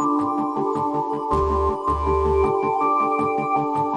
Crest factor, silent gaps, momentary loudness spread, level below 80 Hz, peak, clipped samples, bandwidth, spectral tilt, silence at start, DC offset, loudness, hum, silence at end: 12 dB; none; 4 LU; -34 dBFS; -10 dBFS; under 0.1%; 10.5 kHz; -8 dB/octave; 0 s; under 0.1%; -21 LUFS; none; 0 s